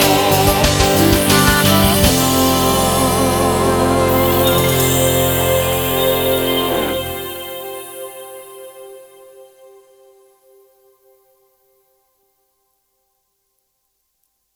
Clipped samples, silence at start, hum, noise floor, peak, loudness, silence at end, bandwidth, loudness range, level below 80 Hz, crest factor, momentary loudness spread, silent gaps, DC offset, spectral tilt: under 0.1%; 0 s; none; -69 dBFS; 0 dBFS; -14 LUFS; 5.5 s; over 20 kHz; 18 LU; -32 dBFS; 16 dB; 18 LU; none; under 0.1%; -4 dB/octave